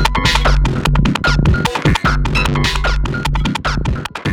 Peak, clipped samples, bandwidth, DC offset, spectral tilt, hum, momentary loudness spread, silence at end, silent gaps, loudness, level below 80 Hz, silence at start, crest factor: 0 dBFS; under 0.1%; 15 kHz; under 0.1%; -5 dB/octave; none; 5 LU; 0 s; none; -15 LUFS; -18 dBFS; 0 s; 14 dB